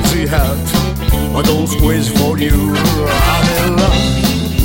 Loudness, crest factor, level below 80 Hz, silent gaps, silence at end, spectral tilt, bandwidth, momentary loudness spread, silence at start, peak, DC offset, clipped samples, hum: -13 LUFS; 12 dB; -18 dBFS; none; 0 s; -5 dB/octave; 17 kHz; 3 LU; 0 s; 0 dBFS; under 0.1%; under 0.1%; none